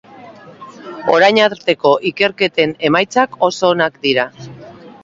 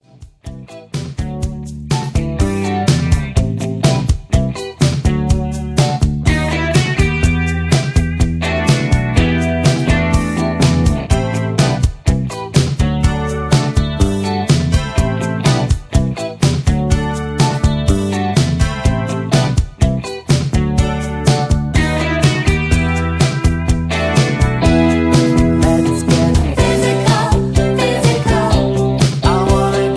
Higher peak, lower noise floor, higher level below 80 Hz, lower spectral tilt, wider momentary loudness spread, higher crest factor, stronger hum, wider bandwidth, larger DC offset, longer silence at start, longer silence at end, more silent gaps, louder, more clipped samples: about the same, 0 dBFS vs 0 dBFS; first, -38 dBFS vs -34 dBFS; second, -58 dBFS vs -22 dBFS; second, -4.5 dB/octave vs -6 dB/octave; first, 14 LU vs 5 LU; about the same, 16 dB vs 14 dB; neither; second, 7.8 kHz vs 11 kHz; neither; about the same, 0.2 s vs 0.2 s; first, 0.15 s vs 0 s; neither; about the same, -14 LUFS vs -15 LUFS; neither